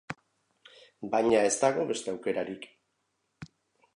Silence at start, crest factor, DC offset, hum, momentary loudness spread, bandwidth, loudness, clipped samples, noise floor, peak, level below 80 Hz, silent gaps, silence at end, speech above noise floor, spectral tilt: 0.1 s; 20 dB; under 0.1%; none; 26 LU; 11.5 kHz; -28 LUFS; under 0.1%; -78 dBFS; -10 dBFS; -70 dBFS; none; 0.5 s; 50 dB; -3.5 dB/octave